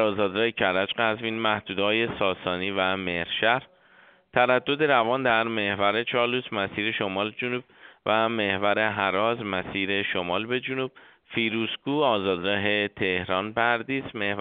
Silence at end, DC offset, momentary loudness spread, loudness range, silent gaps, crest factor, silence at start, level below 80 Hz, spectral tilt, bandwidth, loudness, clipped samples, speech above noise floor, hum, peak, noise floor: 0 s; under 0.1%; 6 LU; 2 LU; none; 22 dB; 0 s; -62 dBFS; -2 dB/octave; 4.7 kHz; -25 LUFS; under 0.1%; 31 dB; none; -4 dBFS; -56 dBFS